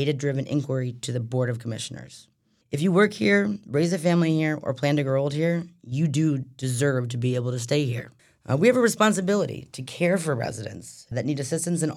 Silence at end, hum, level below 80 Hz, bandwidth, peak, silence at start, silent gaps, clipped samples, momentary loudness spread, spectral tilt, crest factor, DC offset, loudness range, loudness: 0 s; none; -66 dBFS; 14.5 kHz; -6 dBFS; 0 s; none; under 0.1%; 13 LU; -6 dB/octave; 18 dB; under 0.1%; 3 LU; -24 LUFS